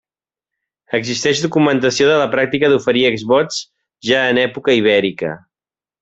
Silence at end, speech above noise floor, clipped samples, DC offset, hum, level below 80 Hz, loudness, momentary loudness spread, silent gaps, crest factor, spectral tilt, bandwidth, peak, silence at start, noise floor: 0.65 s; over 75 dB; under 0.1%; under 0.1%; none; -56 dBFS; -15 LUFS; 10 LU; none; 14 dB; -4 dB/octave; 8.2 kHz; -2 dBFS; 0.9 s; under -90 dBFS